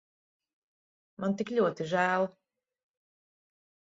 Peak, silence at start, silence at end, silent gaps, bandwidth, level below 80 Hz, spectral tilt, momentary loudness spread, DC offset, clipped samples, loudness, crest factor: -14 dBFS; 1.2 s; 1.65 s; none; 7.8 kHz; -78 dBFS; -6.5 dB/octave; 7 LU; under 0.1%; under 0.1%; -30 LUFS; 20 dB